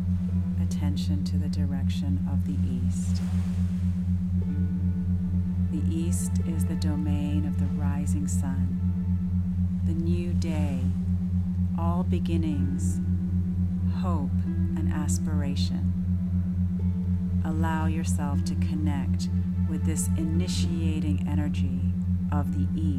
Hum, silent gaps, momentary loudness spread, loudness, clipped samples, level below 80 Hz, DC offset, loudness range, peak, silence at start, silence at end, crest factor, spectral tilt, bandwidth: none; none; 1 LU; -27 LUFS; under 0.1%; -40 dBFS; under 0.1%; 1 LU; -14 dBFS; 0 s; 0 s; 12 dB; -7 dB/octave; 12.5 kHz